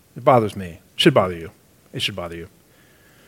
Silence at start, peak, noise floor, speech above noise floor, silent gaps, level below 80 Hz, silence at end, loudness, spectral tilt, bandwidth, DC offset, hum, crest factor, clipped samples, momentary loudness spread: 0.15 s; 0 dBFS; -53 dBFS; 34 dB; none; -54 dBFS; 0.8 s; -19 LUFS; -5.5 dB/octave; 17 kHz; under 0.1%; none; 22 dB; under 0.1%; 20 LU